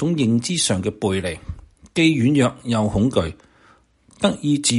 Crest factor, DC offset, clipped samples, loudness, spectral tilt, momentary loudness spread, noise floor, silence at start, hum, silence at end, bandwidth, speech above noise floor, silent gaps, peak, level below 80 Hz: 18 dB; under 0.1%; under 0.1%; -20 LUFS; -5 dB/octave; 12 LU; -55 dBFS; 0 s; none; 0 s; 11.5 kHz; 36 dB; none; -2 dBFS; -44 dBFS